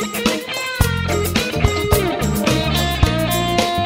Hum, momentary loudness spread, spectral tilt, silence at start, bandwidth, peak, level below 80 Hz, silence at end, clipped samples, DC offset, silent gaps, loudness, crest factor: none; 3 LU; -4.5 dB/octave; 0 s; 16.5 kHz; 0 dBFS; -28 dBFS; 0 s; under 0.1%; under 0.1%; none; -18 LUFS; 18 dB